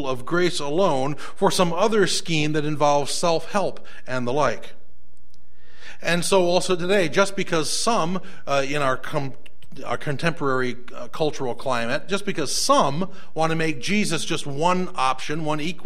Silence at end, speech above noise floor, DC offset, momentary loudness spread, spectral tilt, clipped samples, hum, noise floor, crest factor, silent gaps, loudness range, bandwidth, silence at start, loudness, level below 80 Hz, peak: 0.05 s; 34 dB; 6%; 10 LU; -4 dB/octave; under 0.1%; none; -57 dBFS; 20 dB; none; 5 LU; 16 kHz; 0 s; -23 LUFS; -54 dBFS; -2 dBFS